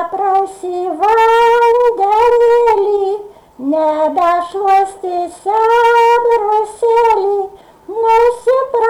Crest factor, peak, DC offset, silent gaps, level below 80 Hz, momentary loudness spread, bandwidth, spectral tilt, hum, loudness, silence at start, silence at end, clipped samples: 8 dB; -4 dBFS; under 0.1%; none; -48 dBFS; 10 LU; 12.5 kHz; -3.5 dB/octave; none; -12 LUFS; 0 s; 0 s; under 0.1%